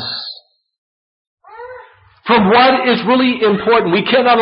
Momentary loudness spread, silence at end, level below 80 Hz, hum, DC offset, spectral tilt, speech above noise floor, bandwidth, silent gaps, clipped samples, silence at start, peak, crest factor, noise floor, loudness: 20 LU; 0 s; -52 dBFS; none; under 0.1%; -10.5 dB/octave; 30 dB; 5.6 kHz; 0.78-1.37 s; under 0.1%; 0 s; -2 dBFS; 14 dB; -41 dBFS; -12 LUFS